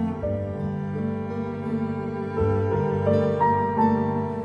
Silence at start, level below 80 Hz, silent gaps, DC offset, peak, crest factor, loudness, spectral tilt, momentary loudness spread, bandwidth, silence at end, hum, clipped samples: 0 s; -46 dBFS; none; under 0.1%; -8 dBFS; 16 dB; -25 LUFS; -10 dB/octave; 8 LU; 7 kHz; 0 s; 50 Hz at -40 dBFS; under 0.1%